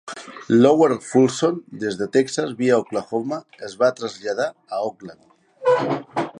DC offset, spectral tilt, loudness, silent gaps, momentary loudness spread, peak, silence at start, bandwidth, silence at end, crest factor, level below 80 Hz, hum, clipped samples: under 0.1%; -5.5 dB/octave; -21 LUFS; none; 13 LU; -2 dBFS; 0.05 s; 11 kHz; 0 s; 18 dB; -68 dBFS; none; under 0.1%